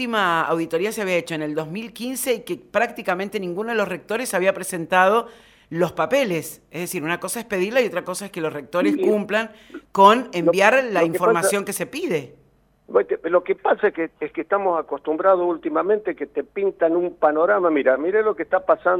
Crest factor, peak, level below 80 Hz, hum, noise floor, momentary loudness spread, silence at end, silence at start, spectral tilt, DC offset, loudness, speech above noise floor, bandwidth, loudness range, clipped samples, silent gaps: 22 dB; 0 dBFS; -62 dBFS; none; -58 dBFS; 11 LU; 0 s; 0 s; -4.5 dB/octave; under 0.1%; -21 LUFS; 37 dB; 18 kHz; 5 LU; under 0.1%; none